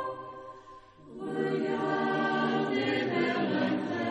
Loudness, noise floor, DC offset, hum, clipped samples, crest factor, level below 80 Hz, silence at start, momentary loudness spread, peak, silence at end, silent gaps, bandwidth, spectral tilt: -30 LUFS; -52 dBFS; under 0.1%; none; under 0.1%; 14 dB; -70 dBFS; 0 s; 17 LU; -16 dBFS; 0 s; none; 9.8 kHz; -6.5 dB/octave